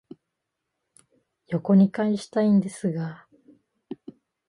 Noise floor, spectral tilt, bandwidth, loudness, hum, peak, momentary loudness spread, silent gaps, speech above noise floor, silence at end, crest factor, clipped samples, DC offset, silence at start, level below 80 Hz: -82 dBFS; -8 dB/octave; 11 kHz; -23 LUFS; none; -8 dBFS; 22 LU; none; 60 dB; 0.55 s; 18 dB; under 0.1%; under 0.1%; 1.5 s; -70 dBFS